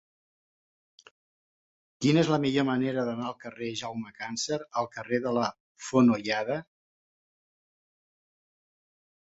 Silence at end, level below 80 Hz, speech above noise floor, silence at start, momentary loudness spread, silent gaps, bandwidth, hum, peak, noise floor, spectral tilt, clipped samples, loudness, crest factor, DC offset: 2.75 s; -68 dBFS; over 62 dB; 2 s; 13 LU; 5.60-5.75 s; 8 kHz; none; -10 dBFS; under -90 dBFS; -5.5 dB/octave; under 0.1%; -28 LUFS; 22 dB; under 0.1%